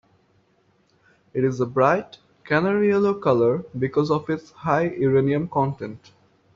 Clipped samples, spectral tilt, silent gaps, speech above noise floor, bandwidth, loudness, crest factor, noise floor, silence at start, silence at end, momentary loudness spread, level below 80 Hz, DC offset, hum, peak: under 0.1%; -6.5 dB/octave; none; 42 dB; 7.2 kHz; -22 LUFS; 18 dB; -63 dBFS; 1.35 s; 0.6 s; 9 LU; -60 dBFS; under 0.1%; none; -4 dBFS